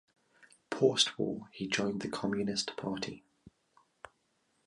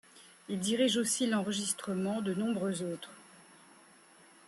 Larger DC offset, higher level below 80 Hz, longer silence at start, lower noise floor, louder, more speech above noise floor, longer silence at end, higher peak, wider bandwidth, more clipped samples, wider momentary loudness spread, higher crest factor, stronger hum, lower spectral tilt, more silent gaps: neither; first, -70 dBFS vs -78 dBFS; first, 0.7 s vs 0.15 s; first, -76 dBFS vs -60 dBFS; about the same, -33 LUFS vs -32 LUFS; first, 43 dB vs 27 dB; first, 1.2 s vs 1.05 s; first, -12 dBFS vs -18 dBFS; second, 11.5 kHz vs 13 kHz; neither; about the same, 13 LU vs 12 LU; first, 24 dB vs 16 dB; neither; about the same, -3.5 dB/octave vs -4 dB/octave; neither